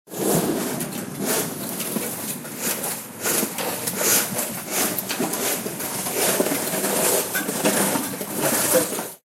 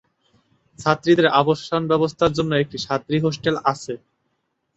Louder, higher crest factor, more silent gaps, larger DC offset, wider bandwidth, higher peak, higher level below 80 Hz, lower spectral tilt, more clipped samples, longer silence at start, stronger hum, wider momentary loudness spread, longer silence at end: about the same, -22 LUFS vs -20 LUFS; about the same, 20 dB vs 20 dB; neither; neither; first, 16.5 kHz vs 8.2 kHz; second, -4 dBFS vs 0 dBFS; second, -62 dBFS vs -52 dBFS; second, -2.5 dB/octave vs -6 dB/octave; neither; second, 0.05 s vs 0.8 s; neither; about the same, 8 LU vs 10 LU; second, 0.1 s vs 0.8 s